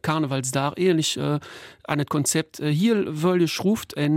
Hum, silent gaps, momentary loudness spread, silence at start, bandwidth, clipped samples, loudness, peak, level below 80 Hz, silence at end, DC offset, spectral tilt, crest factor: none; none; 6 LU; 0.05 s; 16.5 kHz; under 0.1%; -23 LUFS; -8 dBFS; -62 dBFS; 0 s; under 0.1%; -5 dB/octave; 16 dB